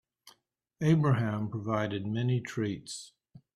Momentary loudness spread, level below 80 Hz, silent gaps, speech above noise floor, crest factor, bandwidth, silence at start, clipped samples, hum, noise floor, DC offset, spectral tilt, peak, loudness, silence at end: 15 LU; -64 dBFS; none; 39 dB; 16 dB; 12 kHz; 0.25 s; under 0.1%; none; -69 dBFS; under 0.1%; -7 dB/octave; -14 dBFS; -31 LUFS; 0.2 s